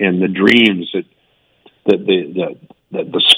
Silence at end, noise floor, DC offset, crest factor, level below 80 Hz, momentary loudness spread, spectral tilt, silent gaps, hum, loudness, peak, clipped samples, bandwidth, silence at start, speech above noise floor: 0 s; -58 dBFS; under 0.1%; 16 dB; -62 dBFS; 15 LU; -4.5 dB/octave; none; none; -15 LUFS; 0 dBFS; 0.3%; over 20 kHz; 0 s; 44 dB